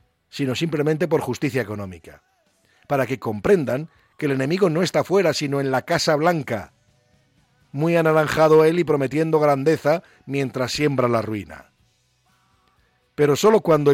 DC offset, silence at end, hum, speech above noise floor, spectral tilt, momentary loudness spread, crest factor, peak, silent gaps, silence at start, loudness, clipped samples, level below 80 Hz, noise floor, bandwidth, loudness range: under 0.1%; 0 s; none; 44 dB; -6 dB/octave; 13 LU; 14 dB; -6 dBFS; none; 0.35 s; -20 LUFS; under 0.1%; -56 dBFS; -63 dBFS; 16.5 kHz; 6 LU